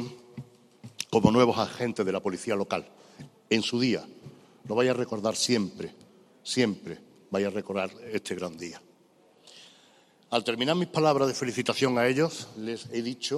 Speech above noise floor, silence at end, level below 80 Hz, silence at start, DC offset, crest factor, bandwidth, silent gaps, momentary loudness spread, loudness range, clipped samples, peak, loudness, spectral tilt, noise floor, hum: 33 dB; 0 s; -64 dBFS; 0 s; under 0.1%; 26 dB; 14 kHz; none; 17 LU; 6 LU; under 0.1%; -4 dBFS; -28 LUFS; -4.5 dB/octave; -61 dBFS; none